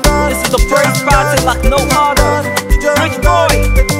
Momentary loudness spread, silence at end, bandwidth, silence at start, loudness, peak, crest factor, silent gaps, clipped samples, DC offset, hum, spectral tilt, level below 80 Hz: 3 LU; 0 s; 16.5 kHz; 0 s; -11 LUFS; 0 dBFS; 10 dB; none; under 0.1%; under 0.1%; none; -4 dB/octave; -16 dBFS